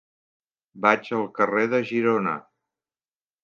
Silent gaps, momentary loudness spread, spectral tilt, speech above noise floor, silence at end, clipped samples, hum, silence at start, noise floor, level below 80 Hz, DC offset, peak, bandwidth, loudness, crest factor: none; 8 LU; -6.5 dB/octave; over 67 dB; 1.05 s; under 0.1%; none; 0.75 s; under -90 dBFS; -76 dBFS; under 0.1%; -2 dBFS; 7 kHz; -23 LUFS; 24 dB